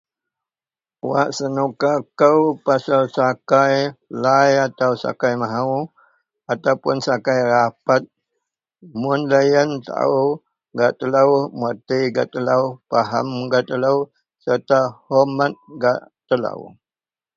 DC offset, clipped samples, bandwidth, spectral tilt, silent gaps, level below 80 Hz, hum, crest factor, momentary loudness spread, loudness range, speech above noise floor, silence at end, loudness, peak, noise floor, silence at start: under 0.1%; under 0.1%; 7.6 kHz; -6 dB/octave; none; -66 dBFS; none; 18 dB; 9 LU; 3 LU; over 72 dB; 0.7 s; -19 LUFS; -2 dBFS; under -90 dBFS; 1.05 s